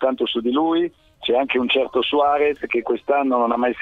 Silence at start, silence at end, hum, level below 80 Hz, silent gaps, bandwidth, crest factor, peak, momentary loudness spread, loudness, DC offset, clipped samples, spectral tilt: 0 s; 0 s; none; -56 dBFS; none; 4.9 kHz; 14 dB; -6 dBFS; 4 LU; -20 LUFS; under 0.1%; under 0.1%; -6 dB/octave